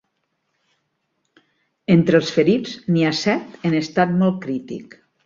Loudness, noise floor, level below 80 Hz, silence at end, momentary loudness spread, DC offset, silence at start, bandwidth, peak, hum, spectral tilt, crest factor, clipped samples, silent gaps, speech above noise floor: -19 LUFS; -72 dBFS; -60 dBFS; 0.4 s; 12 LU; under 0.1%; 1.9 s; 7.6 kHz; -2 dBFS; none; -6.5 dB/octave; 18 dB; under 0.1%; none; 54 dB